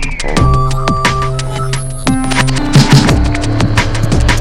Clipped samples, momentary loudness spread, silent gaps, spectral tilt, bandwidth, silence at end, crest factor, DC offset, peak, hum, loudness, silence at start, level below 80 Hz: 0.5%; 9 LU; none; -5 dB/octave; 14.5 kHz; 0 s; 10 dB; under 0.1%; 0 dBFS; none; -12 LUFS; 0 s; -16 dBFS